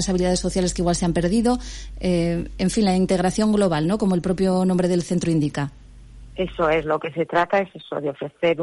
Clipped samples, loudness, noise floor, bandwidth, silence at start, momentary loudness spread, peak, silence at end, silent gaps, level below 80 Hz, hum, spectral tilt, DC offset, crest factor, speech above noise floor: under 0.1%; -22 LUFS; -42 dBFS; 11.5 kHz; 0 s; 9 LU; -10 dBFS; 0 s; none; -38 dBFS; none; -6 dB/octave; under 0.1%; 12 dB; 21 dB